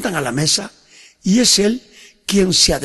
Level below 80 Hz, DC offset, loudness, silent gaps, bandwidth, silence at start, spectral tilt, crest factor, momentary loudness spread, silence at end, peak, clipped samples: -38 dBFS; under 0.1%; -15 LUFS; none; 12.5 kHz; 0 s; -3 dB/octave; 16 dB; 15 LU; 0 s; -2 dBFS; under 0.1%